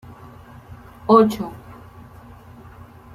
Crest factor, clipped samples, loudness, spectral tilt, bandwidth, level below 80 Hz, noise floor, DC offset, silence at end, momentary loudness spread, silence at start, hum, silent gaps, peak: 22 dB; under 0.1%; -18 LUFS; -7.5 dB/octave; 14.5 kHz; -52 dBFS; -43 dBFS; under 0.1%; 1.4 s; 28 LU; 1.05 s; none; none; -2 dBFS